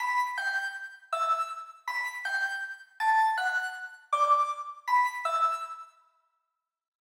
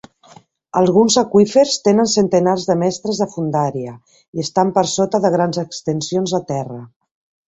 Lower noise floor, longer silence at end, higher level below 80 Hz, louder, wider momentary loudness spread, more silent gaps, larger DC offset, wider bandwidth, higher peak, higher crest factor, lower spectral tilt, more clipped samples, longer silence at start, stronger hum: first, -84 dBFS vs -47 dBFS; first, 1.15 s vs 0.6 s; second, under -90 dBFS vs -58 dBFS; second, -29 LUFS vs -16 LUFS; about the same, 12 LU vs 12 LU; second, none vs 4.28-4.33 s; neither; first, 17 kHz vs 8.2 kHz; second, -14 dBFS vs -2 dBFS; about the same, 16 dB vs 16 dB; second, 6.5 dB/octave vs -5 dB/octave; neither; second, 0 s vs 0.75 s; neither